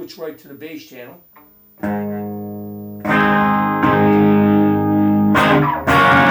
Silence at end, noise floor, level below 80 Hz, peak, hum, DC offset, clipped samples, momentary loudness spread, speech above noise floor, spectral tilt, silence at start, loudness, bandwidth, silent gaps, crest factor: 0 s; -47 dBFS; -46 dBFS; -2 dBFS; none; under 0.1%; under 0.1%; 19 LU; 20 dB; -7 dB/octave; 0 s; -15 LUFS; 19.5 kHz; none; 14 dB